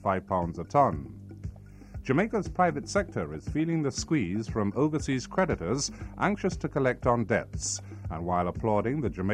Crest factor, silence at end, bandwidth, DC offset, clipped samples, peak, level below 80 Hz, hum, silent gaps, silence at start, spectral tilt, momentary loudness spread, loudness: 18 dB; 0 s; 11 kHz; under 0.1%; under 0.1%; -10 dBFS; -46 dBFS; none; none; 0 s; -5.5 dB/octave; 10 LU; -29 LUFS